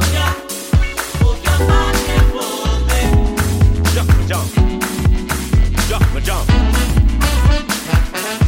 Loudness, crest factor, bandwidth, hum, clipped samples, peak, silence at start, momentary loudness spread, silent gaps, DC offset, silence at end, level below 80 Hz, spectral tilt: -16 LUFS; 12 dB; 17 kHz; none; under 0.1%; -2 dBFS; 0 s; 4 LU; none; under 0.1%; 0 s; -16 dBFS; -5 dB/octave